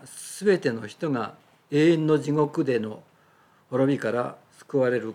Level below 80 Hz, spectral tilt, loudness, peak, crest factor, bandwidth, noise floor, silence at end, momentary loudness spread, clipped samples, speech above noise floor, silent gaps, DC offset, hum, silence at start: -78 dBFS; -6.5 dB/octave; -25 LUFS; -10 dBFS; 16 dB; 14.5 kHz; -59 dBFS; 0 s; 13 LU; under 0.1%; 36 dB; none; under 0.1%; none; 0.05 s